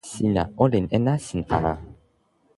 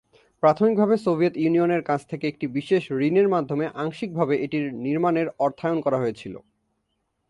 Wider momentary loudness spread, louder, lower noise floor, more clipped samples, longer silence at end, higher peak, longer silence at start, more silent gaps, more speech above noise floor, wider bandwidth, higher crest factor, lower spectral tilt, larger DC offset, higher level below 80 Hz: second, 6 LU vs 9 LU; about the same, -23 LUFS vs -23 LUFS; second, -64 dBFS vs -75 dBFS; neither; second, 0.65 s vs 0.9 s; about the same, -4 dBFS vs -6 dBFS; second, 0.05 s vs 0.45 s; neither; second, 42 dB vs 52 dB; about the same, 11.5 kHz vs 11 kHz; about the same, 20 dB vs 18 dB; about the same, -7 dB/octave vs -8 dB/octave; neither; first, -42 dBFS vs -66 dBFS